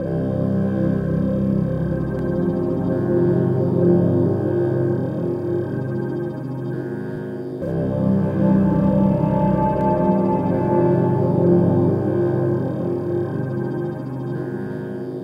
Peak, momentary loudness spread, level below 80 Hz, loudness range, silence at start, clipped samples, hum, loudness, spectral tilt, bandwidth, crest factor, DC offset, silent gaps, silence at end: -4 dBFS; 10 LU; -42 dBFS; 6 LU; 0 s; under 0.1%; none; -20 LUFS; -11 dB/octave; 5.2 kHz; 14 dB; under 0.1%; none; 0 s